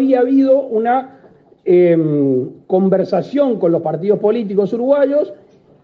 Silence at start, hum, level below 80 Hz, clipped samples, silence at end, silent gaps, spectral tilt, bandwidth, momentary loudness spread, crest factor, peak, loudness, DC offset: 0 s; none; -64 dBFS; under 0.1%; 0.5 s; none; -10 dB/octave; 5.6 kHz; 7 LU; 14 dB; -2 dBFS; -15 LUFS; under 0.1%